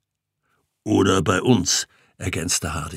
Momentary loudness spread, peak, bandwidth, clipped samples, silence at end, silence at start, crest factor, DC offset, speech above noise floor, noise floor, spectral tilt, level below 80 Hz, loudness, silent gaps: 14 LU; -2 dBFS; 16 kHz; under 0.1%; 0 s; 0.85 s; 20 dB; under 0.1%; 56 dB; -76 dBFS; -4 dB/octave; -46 dBFS; -20 LUFS; none